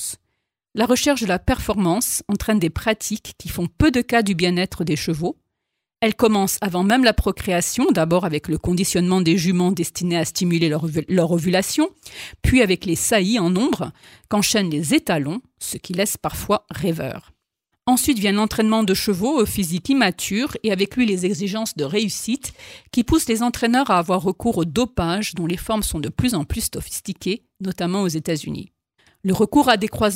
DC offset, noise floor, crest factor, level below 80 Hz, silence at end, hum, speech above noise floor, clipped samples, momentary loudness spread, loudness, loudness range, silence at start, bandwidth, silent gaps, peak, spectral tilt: under 0.1%; -80 dBFS; 18 dB; -38 dBFS; 0 s; none; 60 dB; under 0.1%; 10 LU; -20 LUFS; 4 LU; 0 s; 16.5 kHz; none; -2 dBFS; -4.5 dB/octave